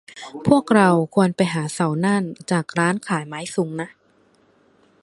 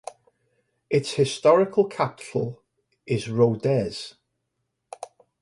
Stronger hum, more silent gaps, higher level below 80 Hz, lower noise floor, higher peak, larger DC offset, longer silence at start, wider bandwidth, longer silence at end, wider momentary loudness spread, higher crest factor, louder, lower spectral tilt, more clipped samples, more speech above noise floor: neither; neither; about the same, -60 dBFS vs -60 dBFS; second, -59 dBFS vs -78 dBFS; first, -2 dBFS vs -6 dBFS; neither; second, 0.15 s vs 0.9 s; about the same, 11.5 kHz vs 11.5 kHz; first, 1.15 s vs 0.35 s; second, 12 LU vs 23 LU; about the same, 20 dB vs 20 dB; first, -20 LUFS vs -23 LUFS; about the same, -6 dB/octave vs -6 dB/octave; neither; second, 39 dB vs 56 dB